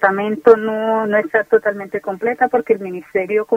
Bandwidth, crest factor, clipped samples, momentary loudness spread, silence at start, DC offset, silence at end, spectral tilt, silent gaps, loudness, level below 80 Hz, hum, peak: 5.2 kHz; 16 dB; under 0.1%; 9 LU; 0 s; under 0.1%; 0 s; -7 dB/octave; none; -17 LUFS; -60 dBFS; none; 0 dBFS